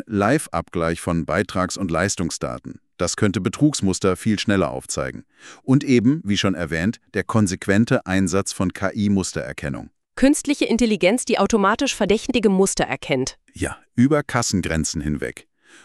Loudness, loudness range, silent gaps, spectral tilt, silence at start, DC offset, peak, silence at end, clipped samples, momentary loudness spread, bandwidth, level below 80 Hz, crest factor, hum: -21 LUFS; 3 LU; none; -5 dB/octave; 0.1 s; under 0.1%; -4 dBFS; 0.45 s; under 0.1%; 11 LU; 13.5 kHz; -44 dBFS; 18 dB; none